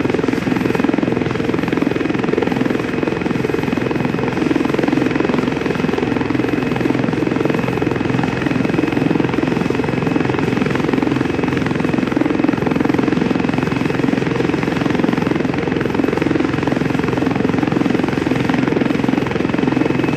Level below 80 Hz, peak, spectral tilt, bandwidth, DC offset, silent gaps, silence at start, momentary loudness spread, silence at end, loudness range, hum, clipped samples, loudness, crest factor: -42 dBFS; 0 dBFS; -7 dB/octave; 13.5 kHz; under 0.1%; none; 0 s; 2 LU; 0 s; 1 LU; none; under 0.1%; -17 LUFS; 16 dB